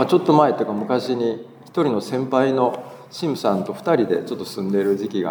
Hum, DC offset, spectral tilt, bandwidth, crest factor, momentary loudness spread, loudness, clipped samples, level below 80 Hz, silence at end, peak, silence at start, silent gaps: none; under 0.1%; -6.5 dB/octave; over 20 kHz; 18 dB; 11 LU; -21 LUFS; under 0.1%; -74 dBFS; 0 s; -2 dBFS; 0 s; none